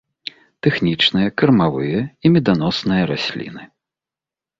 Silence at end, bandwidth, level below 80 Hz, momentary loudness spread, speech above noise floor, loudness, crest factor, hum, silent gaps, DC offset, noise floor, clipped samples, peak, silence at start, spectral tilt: 0.95 s; 7.6 kHz; -50 dBFS; 17 LU; 72 dB; -17 LUFS; 18 dB; none; none; under 0.1%; -89 dBFS; under 0.1%; -2 dBFS; 0.65 s; -7 dB/octave